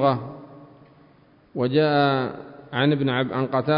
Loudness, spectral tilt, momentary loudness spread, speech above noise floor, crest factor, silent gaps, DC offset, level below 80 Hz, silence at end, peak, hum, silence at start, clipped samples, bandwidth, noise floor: -23 LUFS; -11 dB/octave; 18 LU; 34 dB; 16 dB; none; under 0.1%; -62 dBFS; 0 s; -6 dBFS; none; 0 s; under 0.1%; 5.4 kHz; -55 dBFS